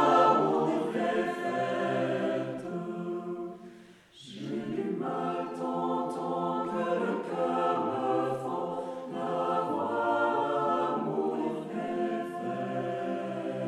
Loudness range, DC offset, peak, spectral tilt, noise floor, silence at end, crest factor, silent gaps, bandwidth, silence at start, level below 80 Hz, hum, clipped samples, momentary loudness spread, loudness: 5 LU; under 0.1%; -12 dBFS; -6.5 dB/octave; -53 dBFS; 0 s; 18 dB; none; 12 kHz; 0 s; -76 dBFS; none; under 0.1%; 9 LU; -31 LUFS